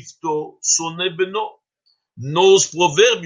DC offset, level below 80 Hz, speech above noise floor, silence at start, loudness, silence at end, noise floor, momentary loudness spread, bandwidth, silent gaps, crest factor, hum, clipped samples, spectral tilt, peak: under 0.1%; -68 dBFS; 49 dB; 0.05 s; -17 LUFS; 0 s; -66 dBFS; 12 LU; 9.6 kHz; none; 18 dB; none; under 0.1%; -2.5 dB/octave; 0 dBFS